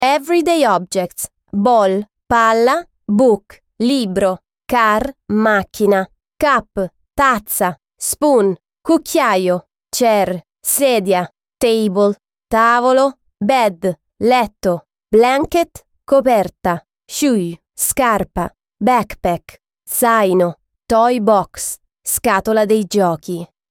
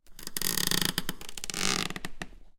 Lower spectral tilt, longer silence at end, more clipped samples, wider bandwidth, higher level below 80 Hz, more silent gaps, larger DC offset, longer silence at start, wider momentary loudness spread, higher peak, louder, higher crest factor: first, -4 dB/octave vs -1.5 dB/octave; first, 0.25 s vs 0.05 s; neither; about the same, 18 kHz vs 17 kHz; about the same, -46 dBFS vs -46 dBFS; neither; neither; about the same, 0 s vs 0.05 s; about the same, 11 LU vs 13 LU; about the same, -2 dBFS vs -4 dBFS; first, -16 LUFS vs -30 LUFS; second, 14 dB vs 28 dB